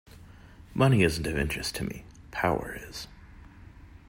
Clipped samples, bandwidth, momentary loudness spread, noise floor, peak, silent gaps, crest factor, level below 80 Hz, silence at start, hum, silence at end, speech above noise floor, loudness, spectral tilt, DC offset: under 0.1%; 16 kHz; 18 LU; -50 dBFS; -10 dBFS; none; 20 dB; -46 dBFS; 0.15 s; none; 0.1 s; 23 dB; -28 LUFS; -5.5 dB/octave; under 0.1%